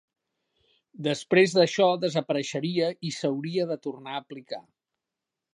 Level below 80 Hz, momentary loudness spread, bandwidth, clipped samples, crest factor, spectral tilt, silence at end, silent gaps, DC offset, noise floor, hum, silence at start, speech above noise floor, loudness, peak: -78 dBFS; 16 LU; 10.5 kHz; under 0.1%; 22 dB; -5 dB/octave; 0.9 s; none; under 0.1%; -87 dBFS; none; 1 s; 61 dB; -26 LUFS; -6 dBFS